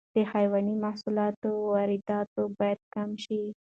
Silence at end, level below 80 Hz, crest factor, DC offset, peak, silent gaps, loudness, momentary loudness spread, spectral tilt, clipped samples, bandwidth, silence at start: 0.15 s; -72 dBFS; 14 dB; under 0.1%; -14 dBFS; 1.37-1.42 s, 2.27-2.36 s, 2.83-2.91 s; -29 LUFS; 7 LU; -7.5 dB/octave; under 0.1%; 7.8 kHz; 0.15 s